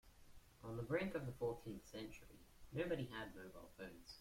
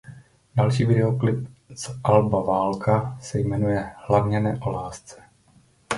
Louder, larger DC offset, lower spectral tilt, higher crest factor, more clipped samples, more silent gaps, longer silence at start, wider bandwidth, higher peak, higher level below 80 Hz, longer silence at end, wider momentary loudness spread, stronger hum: second, -48 LUFS vs -23 LUFS; neither; about the same, -6.5 dB/octave vs -7 dB/octave; about the same, 20 dB vs 20 dB; neither; neither; about the same, 0.05 s vs 0.05 s; first, 16.5 kHz vs 11.5 kHz; second, -28 dBFS vs -2 dBFS; second, -66 dBFS vs -48 dBFS; about the same, 0 s vs 0 s; about the same, 15 LU vs 13 LU; neither